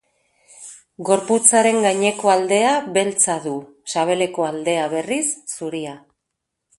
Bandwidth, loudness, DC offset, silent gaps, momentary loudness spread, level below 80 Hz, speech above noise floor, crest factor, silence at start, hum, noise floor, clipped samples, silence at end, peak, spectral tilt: 12 kHz; -18 LUFS; under 0.1%; none; 16 LU; -68 dBFS; 60 dB; 20 dB; 0.6 s; none; -79 dBFS; under 0.1%; 0.8 s; 0 dBFS; -2.5 dB/octave